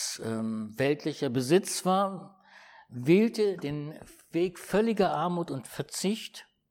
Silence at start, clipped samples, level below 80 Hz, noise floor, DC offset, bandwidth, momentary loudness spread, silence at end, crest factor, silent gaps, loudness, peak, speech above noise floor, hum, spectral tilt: 0 s; under 0.1%; -66 dBFS; -55 dBFS; under 0.1%; 17 kHz; 13 LU; 0.3 s; 18 dB; none; -29 LUFS; -12 dBFS; 26 dB; none; -5 dB/octave